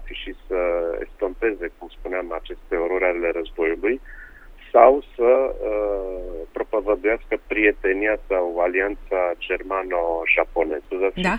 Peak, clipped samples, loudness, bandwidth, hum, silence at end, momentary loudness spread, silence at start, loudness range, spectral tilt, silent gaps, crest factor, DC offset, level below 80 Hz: 0 dBFS; under 0.1%; -22 LUFS; 8.6 kHz; none; 0 s; 12 LU; 0 s; 5 LU; -6.5 dB/octave; none; 22 dB; under 0.1%; -40 dBFS